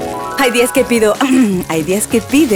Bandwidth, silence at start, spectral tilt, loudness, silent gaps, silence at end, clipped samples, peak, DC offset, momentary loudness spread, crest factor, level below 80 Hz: over 20 kHz; 0 s; -4 dB/octave; -13 LUFS; none; 0 s; under 0.1%; 0 dBFS; under 0.1%; 4 LU; 12 dB; -42 dBFS